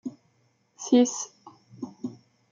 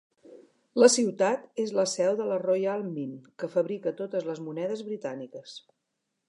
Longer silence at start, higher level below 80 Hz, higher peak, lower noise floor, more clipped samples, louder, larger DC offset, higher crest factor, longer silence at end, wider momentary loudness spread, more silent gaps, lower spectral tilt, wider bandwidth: second, 0.05 s vs 0.3 s; about the same, -80 dBFS vs -84 dBFS; second, -10 dBFS vs -4 dBFS; second, -68 dBFS vs -81 dBFS; neither; first, -25 LUFS vs -28 LUFS; neither; about the same, 20 dB vs 24 dB; second, 0.4 s vs 0.7 s; about the same, 20 LU vs 18 LU; neither; about the same, -4 dB/octave vs -4 dB/octave; second, 7.6 kHz vs 11.5 kHz